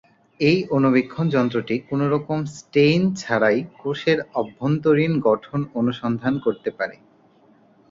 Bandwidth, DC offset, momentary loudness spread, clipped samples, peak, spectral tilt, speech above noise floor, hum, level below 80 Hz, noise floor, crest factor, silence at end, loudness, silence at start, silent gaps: 7.8 kHz; under 0.1%; 9 LU; under 0.1%; -4 dBFS; -7 dB/octave; 34 dB; none; -58 dBFS; -55 dBFS; 16 dB; 1 s; -21 LUFS; 0.4 s; none